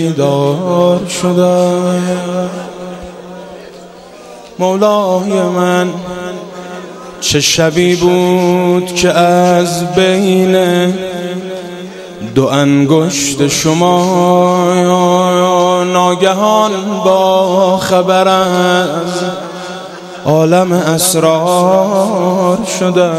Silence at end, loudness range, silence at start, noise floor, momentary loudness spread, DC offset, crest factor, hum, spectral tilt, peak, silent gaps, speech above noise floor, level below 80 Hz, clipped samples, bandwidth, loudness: 0 s; 5 LU; 0 s; -33 dBFS; 16 LU; under 0.1%; 12 dB; none; -5 dB/octave; 0 dBFS; none; 23 dB; -46 dBFS; under 0.1%; 15.5 kHz; -11 LUFS